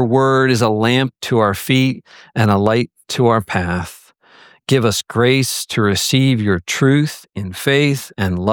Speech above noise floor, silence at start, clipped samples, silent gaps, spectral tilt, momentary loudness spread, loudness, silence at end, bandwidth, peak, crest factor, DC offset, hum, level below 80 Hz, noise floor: 32 dB; 0 s; under 0.1%; none; -5 dB/octave; 9 LU; -16 LUFS; 0 s; 19.5 kHz; -2 dBFS; 14 dB; under 0.1%; none; -48 dBFS; -47 dBFS